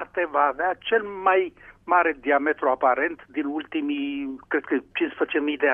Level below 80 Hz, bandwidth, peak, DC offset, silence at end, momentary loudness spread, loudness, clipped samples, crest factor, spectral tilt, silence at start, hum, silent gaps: -62 dBFS; 3.7 kHz; -6 dBFS; under 0.1%; 0 s; 8 LU; -24 LUFS; under 0.1%; 18 dB; -6.5 dB/octave; 0 s; none; none